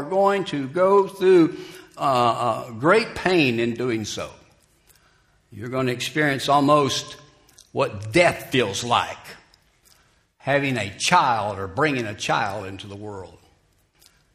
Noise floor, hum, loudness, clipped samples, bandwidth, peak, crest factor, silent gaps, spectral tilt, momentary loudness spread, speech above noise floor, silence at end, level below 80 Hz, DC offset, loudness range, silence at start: -62 dBFS; none; -21 LUFS; under 0.1%; 15.5 kHz; -2 dBFS; 22 dB; none; -4.5 dB/octave; 17 LU; 40 dB; 1.05 s; -58 dBFS; under 0.1%; 4 LU; 0 s